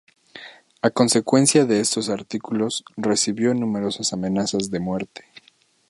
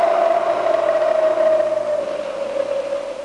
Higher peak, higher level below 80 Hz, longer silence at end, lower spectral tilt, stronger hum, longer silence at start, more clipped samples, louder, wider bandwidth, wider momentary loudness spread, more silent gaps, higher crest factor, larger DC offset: first, -2 dBFS vs -6 dBFS; about the same, -60 dBFS vs -62 dBFS; first, 0.7 s vs 0 s; about the same, -4 dB/octave vs -4 dB/octave; neither; first, 0.35 s vs 0 s; neither; about the same, -21 LUFS vs -19 LUFS; about the same, 11.5 kHz vs 11 kHz; first, 12 LU vs 8 LU; neither; first, 20 dB vs 12 dB; neither